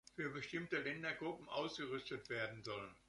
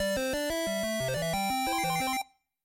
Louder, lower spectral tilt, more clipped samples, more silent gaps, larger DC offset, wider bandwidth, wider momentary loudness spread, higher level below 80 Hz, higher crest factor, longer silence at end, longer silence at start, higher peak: second, -45 LUFS vs -30 LUFS; first, -5 dB/octave vs -3.5 dB/octave; neither; neither; neither; second, 11.5 kHz vs 16 kHz; about the same, 4 LU vs 3 LU; second, -76 dBFS vs -52 dBFS; first, 18 dB vs 10 dB; second, 0.1 s vs 0.4 s; first, 0.15 s vs 0 s; second, -26 dBFS vs -20 dBFS